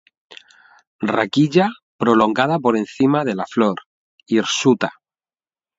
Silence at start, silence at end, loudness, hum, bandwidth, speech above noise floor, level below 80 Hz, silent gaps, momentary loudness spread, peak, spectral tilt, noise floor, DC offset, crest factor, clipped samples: 0.3 s; 0.85 s; -18 LUFS; none; 8 kHz; over 73 dB; -62 dBFS; 0.87-0.99 s, 1.83-1.99 s, 3.86-4.18 s; 7 LU; 0 dBFS; -5.5 dB/octave; under -90 dBFS; under 0.1%; 20 dB; under 0.1%